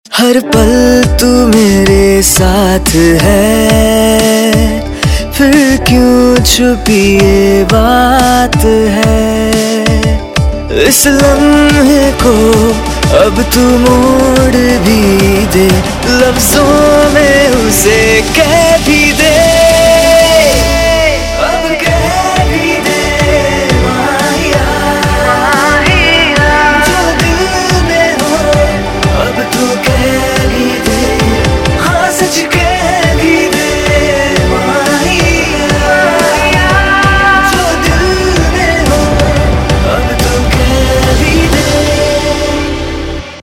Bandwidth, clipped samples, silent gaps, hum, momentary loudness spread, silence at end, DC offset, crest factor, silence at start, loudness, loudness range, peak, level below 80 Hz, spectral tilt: 17 kHz; 0.9%; none; none; 5 LU; 0 s; under 0.1%; 8 dB; 0.1 s; -8 LUFS; 3 LU; 0 dBFS; -18 dBFS; -4.5 dB/octave